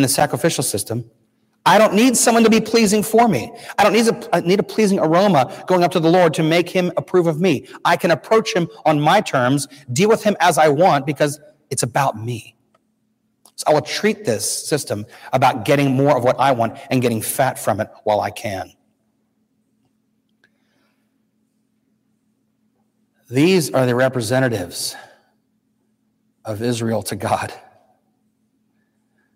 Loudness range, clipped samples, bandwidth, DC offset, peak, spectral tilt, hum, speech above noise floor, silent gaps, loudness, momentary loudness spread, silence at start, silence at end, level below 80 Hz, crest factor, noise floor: 11 LU; under 0.1%; 16 kHz; under 0.1%; -2 dBFS; -4.5 dB/octave; none; 50 dB; none; -17 LUFS; 11 LU; 0 s; 1.75 s; -60 dBFS; 16 dB; -67 dBFS